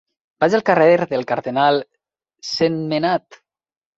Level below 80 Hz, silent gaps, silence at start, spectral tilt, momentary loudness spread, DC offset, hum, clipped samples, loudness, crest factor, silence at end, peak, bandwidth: -62 dBFS; none; 0.4 s; -5.5 dB/octave; 9 LU; under 0.1%; none; under 0.1%; -18 LUFS; 18 dB; 0.6 s; -2 dBFS; 7.8 kHz